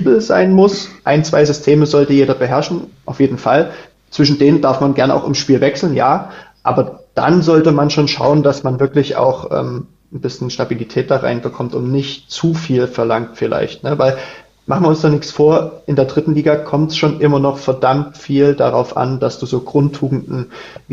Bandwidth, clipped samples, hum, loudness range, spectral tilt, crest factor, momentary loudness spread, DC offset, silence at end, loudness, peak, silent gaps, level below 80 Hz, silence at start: 7.6 kHz; under 0.1%; none; 4 LU; -6.5 dB/octave; 14 dB; 10 LU; under 0.1%; 0 s; -14 LUFS; 0 dBFS; none; -50 dBFS; 0 s